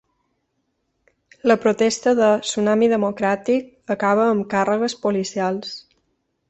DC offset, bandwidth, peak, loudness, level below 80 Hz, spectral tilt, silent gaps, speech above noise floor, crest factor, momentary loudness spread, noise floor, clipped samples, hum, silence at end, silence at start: under 0.1%; 8.2 kHz; -2 dBFS; -20 LUFS; -62 dBFS; -4.5 dB/octave; none; 53 dB; 18 dB; 7 LU; -72 dBFS; under 0.1%; none; 0.7 s; 1.45 s